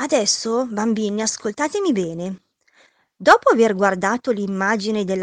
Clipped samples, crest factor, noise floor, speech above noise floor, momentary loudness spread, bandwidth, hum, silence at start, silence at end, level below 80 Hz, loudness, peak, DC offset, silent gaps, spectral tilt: under 0.1%; 20 dB; -57 dBFS; 39 dB; 9 LU; 10.5 kHz; none; 0 s; 0 s; -60 dBFS; -19 LUFS; 0 dBFS; under 0.1%; none; -3.5 dB/octave